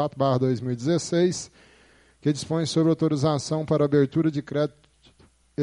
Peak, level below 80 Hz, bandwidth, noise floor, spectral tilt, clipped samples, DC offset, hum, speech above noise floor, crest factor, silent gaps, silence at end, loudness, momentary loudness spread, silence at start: -8 dBFS; -60 dBFS; 11.5 kHz; -58 dBFS; -6.5 dB/octave; under 0.1%; under 0.1%; none; 35 dB; 16 dB; none; 0 s; -24 LUFS; 8 LU; 0 s